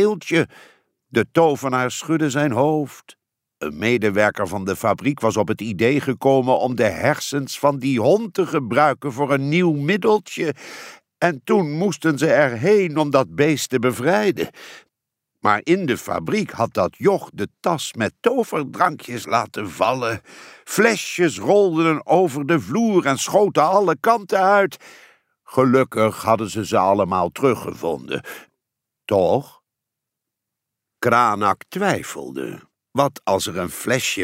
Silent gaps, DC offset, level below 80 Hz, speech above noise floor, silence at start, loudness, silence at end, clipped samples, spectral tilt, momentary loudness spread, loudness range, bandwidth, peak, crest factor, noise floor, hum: none; under 0.1%; -60 dBFS; 64 dB; 0 s; -19 LUFS; 0 s; under 0.1%; -5 dB/octave; 9 LU; 4 LU; 16 kHz; -2 dBFS; 18 dB; -83 dBFS; none